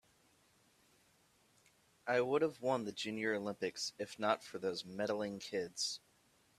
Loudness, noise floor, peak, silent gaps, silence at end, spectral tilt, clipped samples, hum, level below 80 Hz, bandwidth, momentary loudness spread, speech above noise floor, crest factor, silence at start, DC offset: -39 LUFS; -72 dBFS; -16 dBFS; none; 0.6 s; -3.5 dB/octave; under 0.1%; none; -82 dBFS; 14 kHz; 7 LU; 34 dB; 24 dB; 2.05 s; under 0.1%